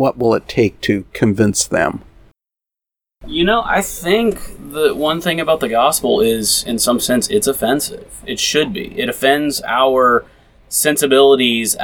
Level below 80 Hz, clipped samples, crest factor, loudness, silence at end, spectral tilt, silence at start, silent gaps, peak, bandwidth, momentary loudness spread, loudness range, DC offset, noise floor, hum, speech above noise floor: -42 dBFS; under 0.1%; 16 dB; -15 LUFS; 0 s; -3.5 dB/octave; 0 s; none; 0 dBFS; over 20 kHz; 8 LU; 4 LU; under 0.1%; -87 dBFS; none; 71 dB